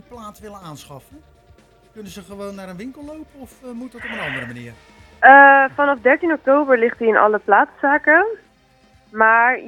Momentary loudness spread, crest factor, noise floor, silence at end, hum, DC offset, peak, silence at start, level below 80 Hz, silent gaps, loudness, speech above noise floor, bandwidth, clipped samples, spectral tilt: 27 LU; 18 dB; -54 dBFS; 0 s; none; under 0.1%; 0 dBFS; 0.1 s; -56 dBFS; none; -14 LUFS; 38 dB; 13.5 kHz; under 0.1%; -5.5 dB/octave